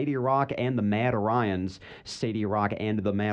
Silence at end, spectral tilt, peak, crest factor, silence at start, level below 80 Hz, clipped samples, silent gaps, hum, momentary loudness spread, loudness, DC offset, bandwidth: 0 s; -7 dB/octave; -12 dBFS; 16 dB; 0 s; -60 dBFS; under 0.1%; none; none; 8 LU; -27 LUFS; under 0.1%; 9.4 kHz